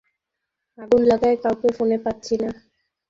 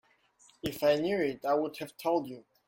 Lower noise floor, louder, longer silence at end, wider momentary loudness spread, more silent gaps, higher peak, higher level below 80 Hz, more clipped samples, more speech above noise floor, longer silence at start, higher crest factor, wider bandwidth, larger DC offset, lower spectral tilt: first, -82 dBFS vs -64 dBFS; first, -21 LUFS vs -31 LUFS; first, 0.55 s vs 0.25 s; about the same, 9 LU vs 11 LU; neither; first, -6 dBFS vs -14 dBFS; first, -54 dBFS vs -66 dBFS; neither; first, 62 dB vs 34 dB; first, 0.8 s vs 0.65 s; about the same, 16 dB vs 18 dB; second, 7.6 kHz vs 16.5 kHz; neither; about the same, -6 dB/octave vs -5.5 dB/octave